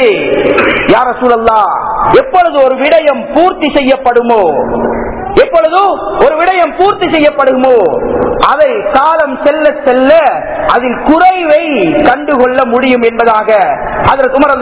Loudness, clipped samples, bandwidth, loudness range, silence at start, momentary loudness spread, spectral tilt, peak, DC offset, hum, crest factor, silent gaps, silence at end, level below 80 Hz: -8 LUFS; 4%; 4 kHz; 1 LU; 0 s; 4 LU; -9 dB/octave; 0 dBFS; under 0.1%; none; 8 dB; none; 0 s; -34 dBFS